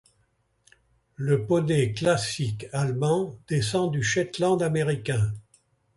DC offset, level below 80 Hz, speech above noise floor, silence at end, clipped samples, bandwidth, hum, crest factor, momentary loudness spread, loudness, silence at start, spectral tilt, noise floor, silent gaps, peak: under 0.1%; -54 dBFS; 44 dB; 0.55 s; under 0.1%; 11.5 kHz; none; 18 dB; 6 LU; -25 LUFS; 1.2 s; -5.5 dB/octave; -69 dBFS; none; -10 dBFS